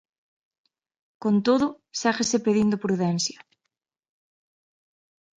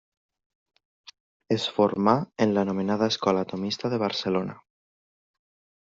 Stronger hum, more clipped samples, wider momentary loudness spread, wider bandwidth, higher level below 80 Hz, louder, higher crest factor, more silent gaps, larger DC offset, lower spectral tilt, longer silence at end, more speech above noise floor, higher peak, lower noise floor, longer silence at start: neither; neither; about the same, 6 LU vs 6 LU; first, 9.4 kHz vs 7.6 kHz; about the same, -64 dBFS vs -68 dBFS; about the same, -24 LUFS vs -25 LUFS; about the same, 20 dB vs 22 dB; neither; neither; about the same, -4.5 dB/octave vs -4.5 dB/octave; first, 2.05 s vs 1.3 s; second, 59 dB vs over 65 dB; about the same, -8 dBFS vs -6 dBFS; second, -82 dBFS vs under -90 dBFS; second, 1.2 s vs 1.5 s